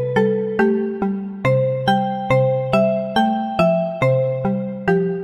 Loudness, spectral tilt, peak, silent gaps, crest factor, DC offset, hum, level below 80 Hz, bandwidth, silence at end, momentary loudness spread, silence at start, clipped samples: -19 LUFS; -8 dB/octave; -4 dBFS; none; 14 dB; under 0.1%; none; -50 dBFS; 11 kHz; 0 s; 5 LU; 0 s; under 0.1%